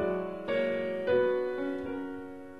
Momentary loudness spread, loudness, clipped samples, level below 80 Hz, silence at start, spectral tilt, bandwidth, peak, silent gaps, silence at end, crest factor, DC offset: 11 LU; -31 LUFS; under 0.1%; -64 dBFS; 0 s; -7.5 dB/octave; 6 kHz; -16 dBFS; none; 0 s; 16 dB; 0.2%